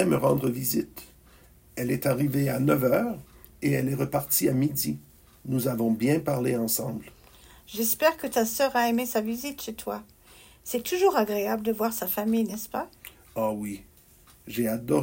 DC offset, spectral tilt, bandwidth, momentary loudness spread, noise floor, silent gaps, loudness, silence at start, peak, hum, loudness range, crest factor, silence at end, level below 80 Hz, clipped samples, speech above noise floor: under 0.1%; -5 dB/octave; 16.5 kHz; 15 LU; -56 dBFS; none; -27 LUFS; 0 s; -8 dBFS; none; 2 LU; 18 dB; 0 s; -58 dBFS; under 0.1%; 30 dB